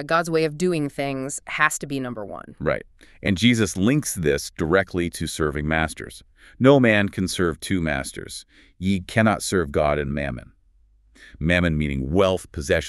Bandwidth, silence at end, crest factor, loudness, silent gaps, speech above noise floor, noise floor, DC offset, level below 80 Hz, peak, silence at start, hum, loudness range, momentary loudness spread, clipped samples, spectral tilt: 13.5 kHz; 0 s; 20 dB; -22 LUFS; none; 35 dB; -58 dBFS; under 0.1%; -40 dBFS; -2 dBFS; 0 s; none; 3 LU; 11 LU; under 0.1%; -5 dB/octave